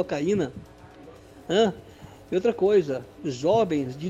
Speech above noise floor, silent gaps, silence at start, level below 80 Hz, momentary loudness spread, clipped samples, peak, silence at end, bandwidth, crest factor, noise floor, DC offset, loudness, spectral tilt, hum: 23 dB; none; 0 s; -56 dBFS; 13 LU; under 0.1%; -8 dBFS; 0 s; 9.8 kHz; 16 dB; -47 dBFS; under 0.1%; -25 LUFS; -6 dB/octave; none